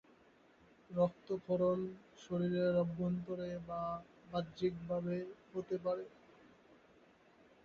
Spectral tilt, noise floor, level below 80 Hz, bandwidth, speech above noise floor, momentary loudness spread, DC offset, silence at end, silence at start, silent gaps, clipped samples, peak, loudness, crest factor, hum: -7.5 dB/octave; -67 dBFS; -70 dBFS; 7 kHz; 29 dB; 11 LU; under 0.1%; 1.2 s; 0.9 s; none; under 0.1%; -22 dBFS; -39 LUFS; 18 dB; none